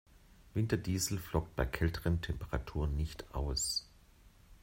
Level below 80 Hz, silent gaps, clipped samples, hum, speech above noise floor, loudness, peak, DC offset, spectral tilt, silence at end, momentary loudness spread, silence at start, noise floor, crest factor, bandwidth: -44 dBFS; none; under 0.1%; none; 26 dB; -36 LUFS; -16 dBFS; under 0.1%; -4.5 dB/octave; 0.05 s; 6 LU; 0.45 s; -61 dBFS; 20 dB; 16 kHz